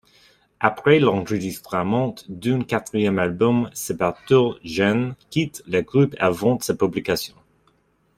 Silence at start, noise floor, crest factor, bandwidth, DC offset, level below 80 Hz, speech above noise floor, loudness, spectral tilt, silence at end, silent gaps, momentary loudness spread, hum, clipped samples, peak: 0.6 s; -63 dBFS; 20 dB; 16 kHz; under 0.1%; -56 dBFS; 42 dB; -21 LUFS; -6 dB/octave; 0.9 s; none; 8 LU; none; under 0.1%; -2 dBFS